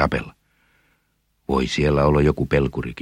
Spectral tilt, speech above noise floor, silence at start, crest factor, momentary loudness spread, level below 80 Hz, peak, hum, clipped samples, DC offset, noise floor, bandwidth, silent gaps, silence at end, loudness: -7 dB/octave; 48 dB; 0 s; 20 dB; 13 LU; -34 dBFS; -2 dBFS; none; under 0.1%; under 0.1%; -68 dBFS; 10.5 kHz; none; 0 s; -20 LUFS